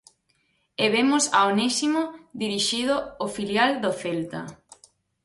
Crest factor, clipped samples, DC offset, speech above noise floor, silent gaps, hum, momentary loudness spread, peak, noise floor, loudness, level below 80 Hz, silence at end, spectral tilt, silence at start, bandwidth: 18 dB; under 0.1%; under 0.1%; 45 dB; none; none; 13 LU; -8 dBFS; -69 dBFS; -23 LUFS; -64 dBFS; 0.7 s; -3 dB/octave; 0.8 s; 11.5 kHz